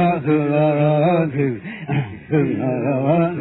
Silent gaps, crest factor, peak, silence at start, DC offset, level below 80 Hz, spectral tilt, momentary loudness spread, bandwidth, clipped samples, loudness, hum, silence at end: none; 14 dB; -4 dBFS; 0 s; under 0.1%; -54 dBFS; -12.5 dB/octave; 7 LU; 4.1 kHz; under 0.1%; -19 LUFS; none; 0 s